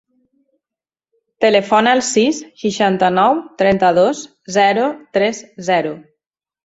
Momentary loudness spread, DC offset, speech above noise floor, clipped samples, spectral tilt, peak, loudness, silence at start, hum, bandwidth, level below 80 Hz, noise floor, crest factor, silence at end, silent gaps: 9 LU; under 0.1%; 73 dB; under 0.1%; -4 dB/octave; 0 dBFS; -15 LUFS; 1.4 s; none; 8 kHz; -56 dBFS; -88 dBFS; 16 dB; 0.65 s; none